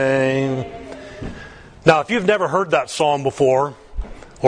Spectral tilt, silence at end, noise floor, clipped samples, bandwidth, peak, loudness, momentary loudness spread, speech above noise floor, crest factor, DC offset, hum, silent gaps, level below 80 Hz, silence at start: -5.5 dB/octave; 0 s; -39 dBFS; under 0.1%; 10.5 kHz; 0 dBFS; -18 LUFS; 19 LU; 22 dB; 20 dB; under 0.1%; none; none; -38 dBFS; 0 s